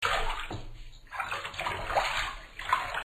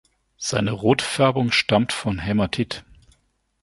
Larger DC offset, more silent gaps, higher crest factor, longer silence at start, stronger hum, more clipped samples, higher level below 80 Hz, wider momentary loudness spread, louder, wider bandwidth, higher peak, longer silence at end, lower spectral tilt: neither; neither; about the same, 20 dB vs 20 dB; second, 0 s vs 0.4 s; neither; neither; about the same, -42 dBFS vs -46 dBFS; first, 13 LU vs 9 LU; second, -32 LUFS vs -21 LUFS; first, 14 kHz vs 11.5 kHz; second, -12 dBFS vs -2 dBFS; second, 0 s vs 0.8 s; second, -2.5 dB/octave vs -5 dB/octave